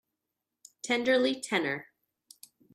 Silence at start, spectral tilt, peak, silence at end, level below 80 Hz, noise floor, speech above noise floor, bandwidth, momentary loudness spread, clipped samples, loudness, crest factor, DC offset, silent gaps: 0.85 s; -3 dB/octave; -12 dBFS; 0.9 s; -80 dBFS; -87 dBFS; 58 dB; 14.5 kHz; 12 LU; under 0.1%; -29 LUFS; 20 dB; under 0.1%; none